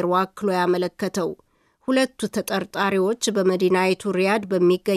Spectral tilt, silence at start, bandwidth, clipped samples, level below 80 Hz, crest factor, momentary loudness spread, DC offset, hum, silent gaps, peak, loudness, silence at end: -5 dB/octave; 0 s; 14.5 kHz; under 0.1%; -64 dBFS; 14 dB; 7 LU; under 0.1%; none; none; -8 dBFS; -22 LUFS; 0 s